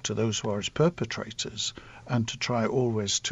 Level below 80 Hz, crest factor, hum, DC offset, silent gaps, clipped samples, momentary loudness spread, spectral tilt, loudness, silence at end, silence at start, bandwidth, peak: -56 dBFS; 16 dB; none; under 0.1%; none; under 0.1%; 7 LU; -4 dB/octave; -28 LUFS; 0 s; 0.05 s; 8.2 kHz; -12 dBFS